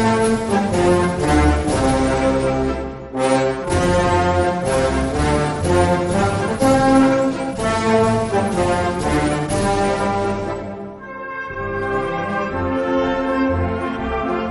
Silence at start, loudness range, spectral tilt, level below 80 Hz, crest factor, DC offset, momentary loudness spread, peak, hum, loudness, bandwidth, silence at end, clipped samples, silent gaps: 0 s; 5 LU; -6 dB/octave; -32 dBFS; 16 dB; under 0.1%; 8 LU; -2 dBFS; none; -18 LUFS; 12 kHz; 0 s; under 0.1%; none